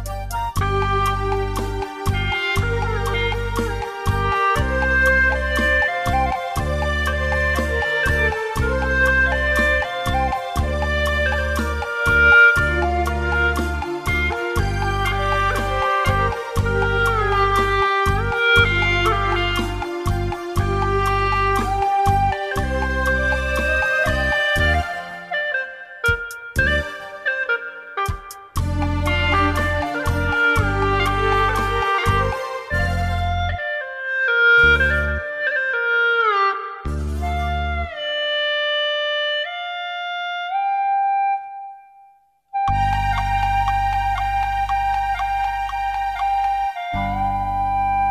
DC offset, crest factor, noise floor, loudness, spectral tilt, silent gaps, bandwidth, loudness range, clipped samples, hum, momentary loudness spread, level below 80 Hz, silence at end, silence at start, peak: under 0.1%; 18 dB; -54 dBFS; -19 LUFS; -5 dB/octave; none; 15.5 kHz; 5 LU; under 0.1%; none; 8 LU; -28 dBFS; 0 s; 0 s; -2 dBFS